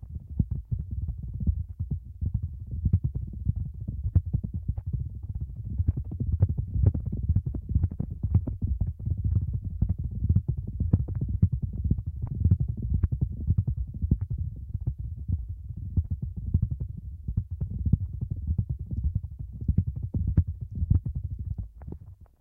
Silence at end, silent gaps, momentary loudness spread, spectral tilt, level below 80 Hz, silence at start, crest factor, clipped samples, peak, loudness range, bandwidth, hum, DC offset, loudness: 0.15 s; none; 9 LU; -13.5 dB/octave; -34 dBFS; 0 s; 22 dB; under 0.1%; -8 dBFS; 4 LU; 1.6 kHz; none; under 0.1%; -30 LUFS